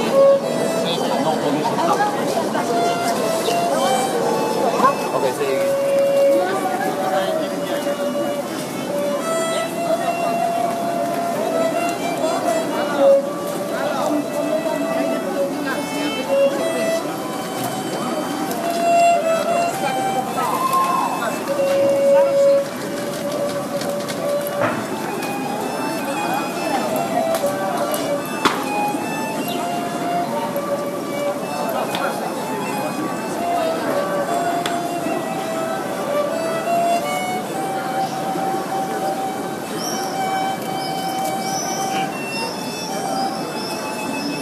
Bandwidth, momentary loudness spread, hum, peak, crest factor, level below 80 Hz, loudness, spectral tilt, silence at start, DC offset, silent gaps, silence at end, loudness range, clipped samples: 15.5 kHz; 7 LU; none; 0 dBFS; 20 dB; -64 dBFS; -20 LUFS; -4 dB/octave; 0 s; under 0.1%; none; 0 s; 5 LU; under 0.1%